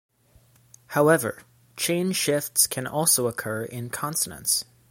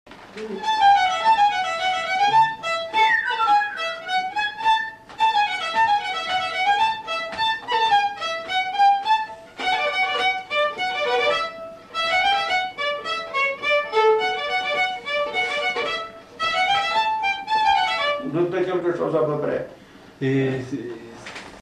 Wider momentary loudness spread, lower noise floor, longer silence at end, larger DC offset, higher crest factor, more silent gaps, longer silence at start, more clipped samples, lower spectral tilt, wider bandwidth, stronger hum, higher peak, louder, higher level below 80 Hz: about the same, 11 LU vs 10 LU; first, -59 dBFS vs -45 dBFS; first, 0.25 s vs 0 s; neither; first, 20 dB vs 14 dB; neither; first, 0.9 s vs 0.05 s; neither; about the same, -3 dB/octave vs -3.5 dB/octave; first, 17 kHz vs 12 kHz; neither; about the same, -6 dBFS vs -8 dBFS; second, -24 LUFS vs -21 LUFS; about the same, -64 dBFS vs -60 dBFS